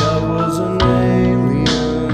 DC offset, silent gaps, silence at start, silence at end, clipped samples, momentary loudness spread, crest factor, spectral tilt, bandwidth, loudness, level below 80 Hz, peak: under 0.1%; none; 0 s; 0 s; under 0.1%; 4 LU; 12 dB; -6.5 dB/octave; 14.5 kHz; -15 LUFS; -30 dBFS; -2 dBFS